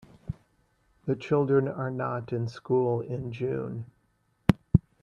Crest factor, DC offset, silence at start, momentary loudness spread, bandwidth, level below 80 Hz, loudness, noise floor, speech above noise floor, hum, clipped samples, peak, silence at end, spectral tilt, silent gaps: 26 dB; under 0.1%; 0.25 s; 17 LU; 12 kHz; -50 dBFS; -29 LUFS; -71 dBFS; 42 dB; none; under 0.1%; -4 dBFS; 0.2 s; -9 dB/octave; none